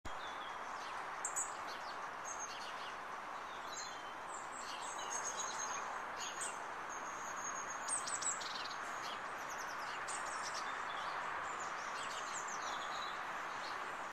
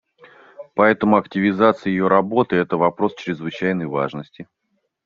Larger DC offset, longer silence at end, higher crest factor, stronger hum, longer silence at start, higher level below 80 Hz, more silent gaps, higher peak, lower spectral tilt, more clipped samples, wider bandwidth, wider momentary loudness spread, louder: neither; second, 0 s vs 0.6 s; about the same, 18 dB vs 18 dB; neither; second, 0.05 s vs 0.6 s; second, -72 dBFS vs -60 dBFS; neither; second, -26 dBFS vs -2 dBFS; second, 0 dB/octave vs -5.5 dB/octave; neither; first, 14 kHz vs 7 kHz; second, 6 LU vs 11 LU; second, -43 LUFS vs -19 LUFS